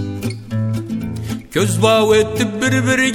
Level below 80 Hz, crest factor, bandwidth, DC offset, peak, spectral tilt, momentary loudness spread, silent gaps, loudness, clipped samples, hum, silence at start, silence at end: -42 dBFS; 16 dB; 17 kHz; under 0.1%; 0 dBFS; -5 dB/octave; 11 LU; none; -17 LUFS; under 0.1%; none; 0 s; 0 s